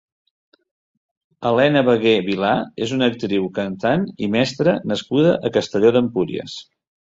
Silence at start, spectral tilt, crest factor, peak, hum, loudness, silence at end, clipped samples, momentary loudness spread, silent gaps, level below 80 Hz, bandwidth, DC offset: 1.4 s; -6 dB/octave; 16 dB; -2 dBFS; none; -19 LUFS; 0.5 s; under 0.1%; 9 LU; none; -56 dBFS; 7.8 kHz; under 0.1%